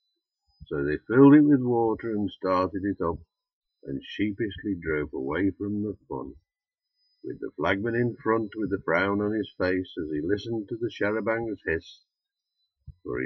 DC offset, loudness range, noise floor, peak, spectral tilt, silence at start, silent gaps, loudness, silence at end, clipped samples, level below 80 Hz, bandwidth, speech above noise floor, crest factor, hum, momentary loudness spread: under 0.1%; 8 LU; -89 dBFS; -6 dBFS; -8.5 dB/octave; 0.6 s; 3.53-3.61 s; -26 LUFS; 0 s; under 0.1%; -54 dBFS; 6 kHz; 63 dB; 20 dB; none; 15 LU